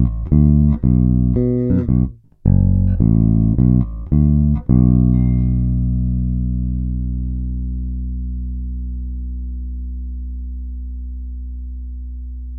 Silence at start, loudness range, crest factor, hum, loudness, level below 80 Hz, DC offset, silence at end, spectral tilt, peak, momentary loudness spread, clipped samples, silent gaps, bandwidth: 0 s; 13 LU; 16 dB; none; -17 LUFS; -22 dBFS; under 0.1%; 0 s; -15 dB/octave; -2 dBFS; 16 LU; under 0.1%; none; 2.2 kHz